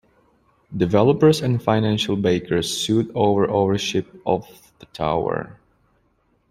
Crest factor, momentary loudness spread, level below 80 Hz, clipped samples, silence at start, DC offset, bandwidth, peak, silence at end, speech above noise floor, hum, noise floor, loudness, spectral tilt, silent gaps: 18 dB; 10 LU; -52 dBFS; under 0.1%; 0.7 s; under 0.1%; 15.5 kHz; -2 dBFS; 1 s; 44 dB; none; -64 dBFS; -20 LUFS; -6 dB/octave; none